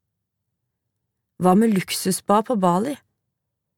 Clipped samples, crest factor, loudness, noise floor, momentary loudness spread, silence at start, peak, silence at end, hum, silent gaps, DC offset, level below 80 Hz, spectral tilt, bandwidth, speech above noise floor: under 0.1%; 20 dB; -20 LUFS; -79 dBFS; 8 LU; 1.4 s; -4 dBFS; 0.85 s; none; none; under 0.1%; -68 dBFS; -5.5 dB/octave; 17.5 kHz; 60 dB